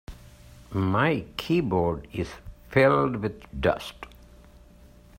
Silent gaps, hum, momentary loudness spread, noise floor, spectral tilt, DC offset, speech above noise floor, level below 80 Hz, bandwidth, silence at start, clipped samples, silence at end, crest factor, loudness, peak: none; none; 20 LU; -52 dBFS; -7 dB/octave; under 0.1%; 27 dB; -48 dBFS; 16 kHz; 0.1 s; under 0.1%; 1.1 s; 20 dB; -26 LUFS; -8 dBFS